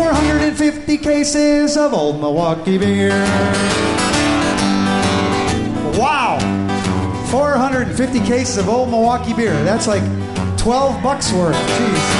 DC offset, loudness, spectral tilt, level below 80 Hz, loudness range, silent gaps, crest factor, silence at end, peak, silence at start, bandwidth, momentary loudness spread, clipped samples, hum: under 0.1%; -16 LUFS; -5 dB/octave; -32 dBFS; 1 LU; none; 12 dB; 0 s; -2 dBFS; 0 s; 11.5 kHz; 4 LU; under 0.1%; none